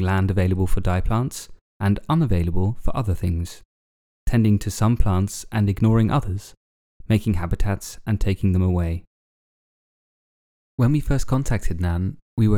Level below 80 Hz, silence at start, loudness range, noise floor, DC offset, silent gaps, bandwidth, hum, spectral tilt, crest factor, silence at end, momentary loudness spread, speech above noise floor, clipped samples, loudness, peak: -30 dBFS; 0 s; 4 LU; under -90 dBFS; under 0.1%; 1.61-1.80 s, 3.65-4.26 s, 6.57-7.00 s, 9.07-10.78 s, 12.22-12.37 s; 15.5 kHz; none; -7 dB/octave; 16 dB; 0 s; 9 LU; over 70 dB; under 0.1%; -23 LUFS; -4 dBFS